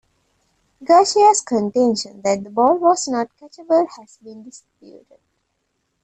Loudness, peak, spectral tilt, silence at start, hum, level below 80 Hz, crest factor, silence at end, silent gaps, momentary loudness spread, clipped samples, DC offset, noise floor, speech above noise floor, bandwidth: -17 LUFS; -2 dBFS; -3.5 dB/octave; 0.8 s; none; -64 dBFS; 18 dB; 1.55 s; none; 13 LU; under 0.1%; under 0.1%; -71 dBFS; 53 dB; 9.4 kHz